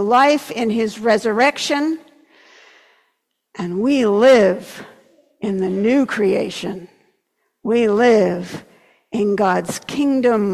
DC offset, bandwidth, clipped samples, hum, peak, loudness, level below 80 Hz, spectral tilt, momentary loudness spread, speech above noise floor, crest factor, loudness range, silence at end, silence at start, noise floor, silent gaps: under 0.1%; 14.5 kHz; under 0.1%; none; -4 dBFS; -17 LUFS; -60 dBFS; -5 dB/octave; 16 LU; 53 dB; 14 dB; 4 LU; 0 s; 0 s; -70 dBFS; none